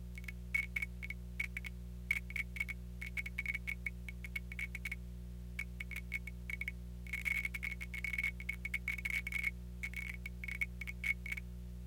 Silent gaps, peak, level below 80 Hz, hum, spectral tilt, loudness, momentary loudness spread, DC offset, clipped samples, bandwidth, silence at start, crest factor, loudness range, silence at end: none; -20 dBFS; -48 dBFS; 60 Hz at -45 dBFS; -4 dB/octave; -41 LUFS; 9 LU; under 0.1%; under 0.1%; 17 kHz; 0 s; 22 dB; 4 LU; 0 s